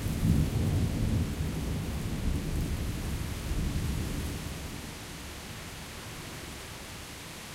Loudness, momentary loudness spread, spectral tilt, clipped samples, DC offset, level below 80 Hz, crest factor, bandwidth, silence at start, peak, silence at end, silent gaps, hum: -34 LUFS; 12 LU; -5.5 dB/octave; under 0.1%; under 0.1%; -38 dBFS; 20 dB; 16 kHz; 0 s; -12 dBFS; 0 s; none; none